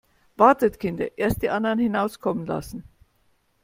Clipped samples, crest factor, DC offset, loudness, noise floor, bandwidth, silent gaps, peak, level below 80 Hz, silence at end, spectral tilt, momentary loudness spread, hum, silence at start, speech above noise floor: under 0.1%; 22 dB; under 0.1%; -23 LUFS; -66 dBFS; 16.5 kHz; none; -2 dBFS; -48 dBFS; 0.85 s; -6.5 dB/octave; 13 LU; none; 0.4 s; 43 dB